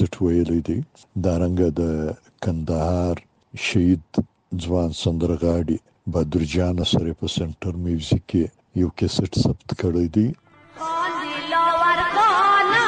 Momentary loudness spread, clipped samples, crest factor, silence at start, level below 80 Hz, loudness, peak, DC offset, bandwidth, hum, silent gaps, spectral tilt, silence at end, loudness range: 10 LU; under 0.1%; 16 dB; 0 s; -40 dBFS; -22 LUFS; -6 dBFS; under 0.1%; 9.6 kHz; none; none; -6 dB/octave; 0 s; 3 LU